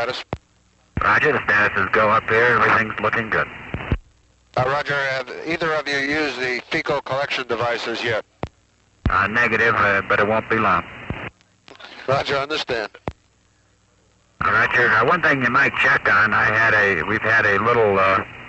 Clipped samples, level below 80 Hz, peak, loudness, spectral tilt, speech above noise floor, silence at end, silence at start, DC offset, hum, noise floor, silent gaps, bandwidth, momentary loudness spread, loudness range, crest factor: under 0.1%; -42 dBFS; -6 dBFS; -18 LUFS; -5 dB/octave; 40 dB; 0 s; 0 s; under 0.1%; none; -59 dBFS; none; 8.2 kHz; 15 LU; 7 LU; 14 dB